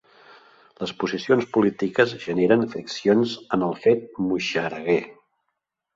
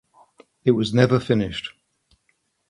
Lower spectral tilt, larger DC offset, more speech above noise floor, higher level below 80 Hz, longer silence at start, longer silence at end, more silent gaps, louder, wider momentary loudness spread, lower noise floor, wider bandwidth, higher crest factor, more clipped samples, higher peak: about the same, -6 dB/octave vs -7 dB/octave; neither; first, 57 dB vs 50 dB; second, -62 dBFS vs -52 dBFS; first, 0.8 s vs 0.65 s; second, 0.85 s vs 1 s; neither; about the same, -23 LUFS vs -21 LUFS; second, 8 LU vs 13 LU; first, -79 dBFS vs -69 dBFS; second, 7.8 kHz vs 11 kHz; about the same, 20 dB vs 22 dB; neither; about the same, -4 dBFS vs -2 dBFS